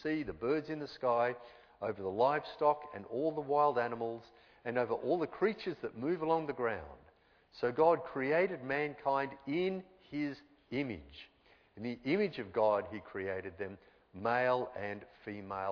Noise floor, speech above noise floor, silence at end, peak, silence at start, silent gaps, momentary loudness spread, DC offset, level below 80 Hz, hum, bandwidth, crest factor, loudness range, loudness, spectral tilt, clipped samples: -66 dBFS; 31 dB; 0 s; -16 dBFS; 0 s; none; 14 LU; under 0.1%; -68 dBFS; none; 5.4 kHz; 20 dB; 4 LU; -35 LUFS; -4.5 dB/octave; under 0.1%